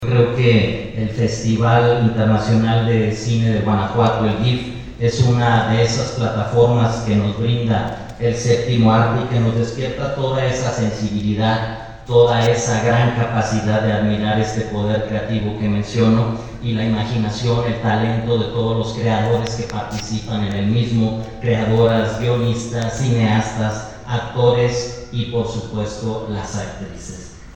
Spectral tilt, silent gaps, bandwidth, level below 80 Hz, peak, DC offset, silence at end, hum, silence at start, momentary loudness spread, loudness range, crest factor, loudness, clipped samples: -6.5 dB/octave; none; 8.6 kHz; -38 dBFS; 0 dBFS; under 0.1%; 0.05 s; none; 0 s; 10 LU; 3 LU; 16 dB; -18 LUFS; under 0.1%